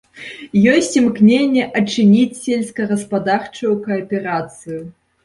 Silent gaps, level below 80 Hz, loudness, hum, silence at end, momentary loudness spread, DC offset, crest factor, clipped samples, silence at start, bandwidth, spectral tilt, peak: none; -56 dBFS; -16 LUFS; none; 0.35 s; 16 LU; under 0.1%; 14 dB; under 0.1%; 0.15 s; 11.5 kHz; -5.5 dB/octave; -2 dBFS